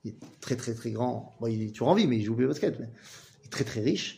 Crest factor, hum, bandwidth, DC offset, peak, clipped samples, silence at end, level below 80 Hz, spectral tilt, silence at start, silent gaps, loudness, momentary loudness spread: 22 dB; none; 15.5 kHz; under 0.1%; -8 dBFS; under 0.1%; 0 s; -66 dBFS; -6 dB/octave; 0.05 s; none; -29 LUFS; 19 LU